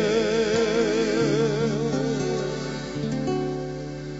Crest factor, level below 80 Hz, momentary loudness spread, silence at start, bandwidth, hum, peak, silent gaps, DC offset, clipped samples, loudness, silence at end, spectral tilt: 14 dB; -48 dBFS; 8 LU; 0 s; 8 kHz; none; -10 dBFS; none; under 0.1%; under 0.1%; -25 LUFS; 0 s; -5.5 dB/octave